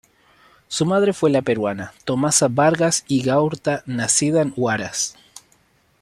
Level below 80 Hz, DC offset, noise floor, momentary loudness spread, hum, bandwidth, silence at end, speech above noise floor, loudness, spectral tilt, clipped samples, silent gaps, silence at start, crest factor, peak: -58 dBFS; under 0.1%; -59 dBFS; 8 LU; none; 14 kHz; 0.9 s; 40 dB; -19 LUFS; -4 dB/octave; under 0.1%; none; 0.7 s; 18 dB; -4 dBFS